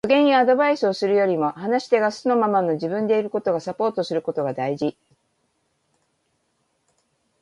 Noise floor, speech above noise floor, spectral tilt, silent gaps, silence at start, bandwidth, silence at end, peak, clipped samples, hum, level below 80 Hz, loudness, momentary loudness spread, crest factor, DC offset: -70 dBFS; 50 dB; -6 dB/octave; none; 0.05 s; 11 kHz; 2.5 s; -6 dBFS; under 0.1%; none; -68 dBFS; -21 LUFS; 8 LU; 16 dB; under 0.1%